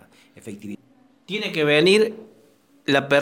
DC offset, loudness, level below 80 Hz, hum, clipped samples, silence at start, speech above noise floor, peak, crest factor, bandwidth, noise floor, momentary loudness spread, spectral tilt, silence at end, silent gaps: under 0.1%; -20 LUFS; -70 dBFS; none; under 0.1%; 0.45 s; 36 dB; -4 dBFS; 18 dB; 16 kHz; -56 dBFS; 25 LU; -4.5 dB/octave; 0 s; none